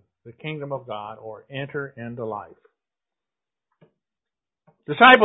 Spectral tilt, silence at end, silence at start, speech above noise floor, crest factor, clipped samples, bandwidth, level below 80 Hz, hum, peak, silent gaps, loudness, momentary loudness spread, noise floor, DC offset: -7 dB/octave; 0 s; 0.25 s; 69 dB; 24 dB; under 0.1%; 4 kHz; -66 dBFS; none; 0 dBFS; none; -23 LUFS; 17 LU; -90 dBFS; under 0.1%